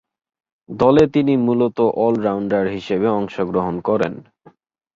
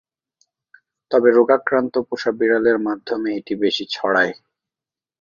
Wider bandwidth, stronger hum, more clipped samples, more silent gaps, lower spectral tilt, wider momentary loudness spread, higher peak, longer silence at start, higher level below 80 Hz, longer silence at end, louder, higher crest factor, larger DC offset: about the same, 7.6 kHz vs 7.2 kHz; neither; neither; neither; first, -8 dB/octave vs -5 dB/octave; about the same, 7 LU vs 9 LU; about the same, -2 dBFS vs -2 dBFS; second, 0.7 s vs 1.1 s; first, -50 dBFS vs -66 dBFS; second, 0.75 s vs 0.9 s; about the same, -18 LUFS vs -19 LUFS; about the same, 18 dB vs 18 dB; neither